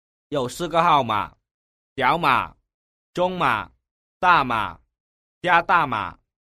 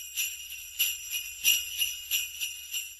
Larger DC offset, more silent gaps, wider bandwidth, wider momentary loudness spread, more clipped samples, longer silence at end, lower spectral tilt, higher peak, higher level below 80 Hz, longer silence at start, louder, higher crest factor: neither; first, 1.51-1.96 s, 2.74-3.13 s, 3.91-4.20 s, 5.00-5.41 s vs none; about the same, 15 kHz vs 16 kHz; first, 16 LU vs 10 LU; neither; first, 0.3 s vs 0 s; first, -5 dB/octave vs 4.5 dB/octave; first, -2 dBFS vs -8 dBFS; first, -52 dBFS vs -64 dBFS; first, 0.3 s vs 0 s; first, -21 LUFS vs -29 LUFS; about the same, 22 dB vs 24 dB